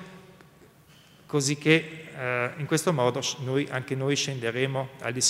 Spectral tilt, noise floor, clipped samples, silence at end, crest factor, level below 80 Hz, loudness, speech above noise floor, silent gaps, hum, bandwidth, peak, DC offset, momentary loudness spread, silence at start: -4 dB/octave; -55 dBFS; under 0.1%; 0 s; 22 dB; -68 dBFS; -27 LUFS; 29 dB; none; none; 16 kHz; -6 dBFS; under 0.1%; 9 LU; 0 s